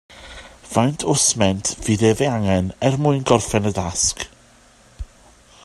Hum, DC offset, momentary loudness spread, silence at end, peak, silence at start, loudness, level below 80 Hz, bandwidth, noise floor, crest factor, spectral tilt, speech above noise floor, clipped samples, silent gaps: none; under 0.1%; 23 LU; 0.6 s; 0 dBFS; 0.1 s; -19 LUFS; -44 dBFS; 13 kHz; -51 dBFS; 20 dB; -4.5 dB/octave; 32 dB; under 0.1%; none